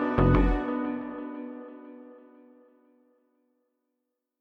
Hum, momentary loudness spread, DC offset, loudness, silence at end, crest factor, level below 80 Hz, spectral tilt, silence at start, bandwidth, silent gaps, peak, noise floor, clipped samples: none; 25 LU; under 0.1%; -28 LUFS; 2.2 s; 22 dB; -36 dBFS; -10 dB/octave; 0 s; 5 kHz; none; -8 dBFS; -83 dBFS; under 0.1%